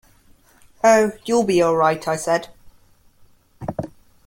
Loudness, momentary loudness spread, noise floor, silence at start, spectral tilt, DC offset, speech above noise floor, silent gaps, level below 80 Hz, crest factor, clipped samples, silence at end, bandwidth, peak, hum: -19 LUFS; 16 LU; -54 dBFS; 0.85 s; -5 dB/octave; under 0.1%; 36 dB; none; -54 dBFS; 18 dB; under 0.1%; 0.4 s; 16.5 kHz; -4 dBFS; none